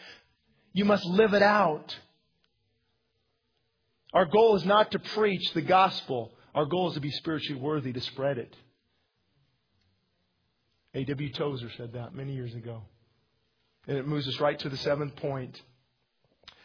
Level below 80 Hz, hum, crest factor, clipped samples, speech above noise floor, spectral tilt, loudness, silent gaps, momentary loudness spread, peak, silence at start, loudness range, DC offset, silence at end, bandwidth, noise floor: -66 dBFS; none; 22 dB; under 0.1%; 49 dB; -6.5 dB/octave; -28 LUFS; none; 18 LU; -8 dBFS; 0 s; 13 LU; under 0.1%; 1.05 s; 5.4 kHz; -76 dBFS